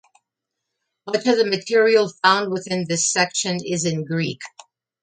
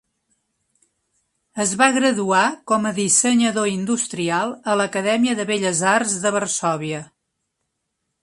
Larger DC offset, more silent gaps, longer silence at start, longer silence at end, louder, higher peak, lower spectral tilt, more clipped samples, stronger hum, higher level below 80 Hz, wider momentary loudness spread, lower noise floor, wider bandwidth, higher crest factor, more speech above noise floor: neither; neither; second, 1.05 s vs 1.55 s; second, 0.55 s vs 1.15 s; about the same, -20 LUFS vs -19 LUFS; about the same, 0 dBFS vs 0 dBFS; about the same, -3.5 dB/octave vs -3 dB/octave; neither; neither; about the same, -68 dBFS vs -66 dBFS; first, 10 LU vs 7 LU; first, -82 dBFS vs -76 dBFS; second, 9.6 kHz vs 11.5 kHz; about the same, 20 dB vs 20 dB; first, 62 dB vs 57 dB